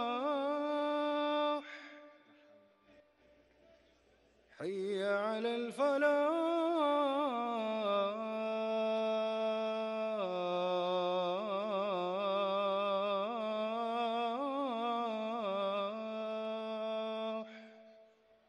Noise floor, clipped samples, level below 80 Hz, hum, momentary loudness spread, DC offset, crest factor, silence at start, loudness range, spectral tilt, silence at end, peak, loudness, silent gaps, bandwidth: -69 dBFS; under 0.1%; -86 dBFS; none; 7 LU; under 0.1%; 16 dB; 0 s; 7 LU; -5.5 dB/octave; 0.45 s; -20 dBFS; -35 LUFS; none; 11.5 kHz